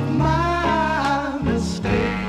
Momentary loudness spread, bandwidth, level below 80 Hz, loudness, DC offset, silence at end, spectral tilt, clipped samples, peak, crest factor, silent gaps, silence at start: 3 LU; 12 kHz; -32 dBFS; -21 LUFS; under 0.1%; 0 s; -6.5 dB/octave; under 0.1%; -6 dBFS; 14 dB; none; 0 s